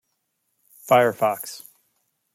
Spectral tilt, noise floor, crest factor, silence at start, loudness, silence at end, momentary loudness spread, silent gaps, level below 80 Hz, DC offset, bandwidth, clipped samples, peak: -4.5 dB/octave; -75 dBFS; 22 dB; 0.85 s; -21 LUFS; 0.75 s; 22 LU; none; -76 dBFS; under 0.1%; 16.5 kHz; under 0.1%; -4 dBFS